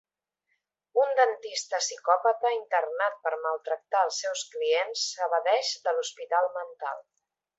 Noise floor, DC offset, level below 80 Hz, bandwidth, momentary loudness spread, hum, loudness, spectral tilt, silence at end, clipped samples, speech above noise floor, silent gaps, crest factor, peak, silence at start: -79 dBFS; under 0.1%; -88 dBFS; 8.2 kHz; 8 LU; none; -28 LUFS; 3 dB/octave; 0.6 s; under 0.1%; 51 dB; none; 20 dB; -8 dBFS; 0.95 s